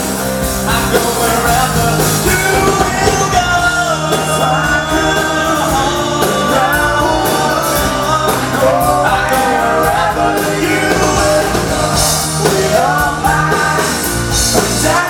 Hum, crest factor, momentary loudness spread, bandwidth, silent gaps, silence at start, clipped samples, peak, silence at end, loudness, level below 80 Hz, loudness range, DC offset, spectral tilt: none; 12 dB; 2 LU; 18 kHz; none; 0 s; under 0.1%; 0 dBFS; 0 s; -12 LUFS; -28 dBFS; 1 LU; under 0.1%; -3.5 dB/octave